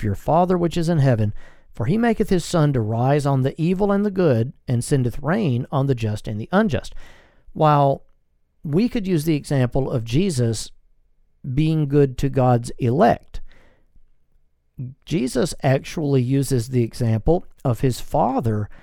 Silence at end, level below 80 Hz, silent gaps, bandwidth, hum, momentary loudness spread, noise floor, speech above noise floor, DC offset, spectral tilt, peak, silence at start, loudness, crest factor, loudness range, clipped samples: 0.05 s; -38 dBFS; none; 16 kHz; none; 8 LU; -61 dBFS; 41 dB; under 0.1%; -7 dB/octave; -2 dBFS; 0 s; -21 LUFS; 18 dB; 3 LU; under 0.1%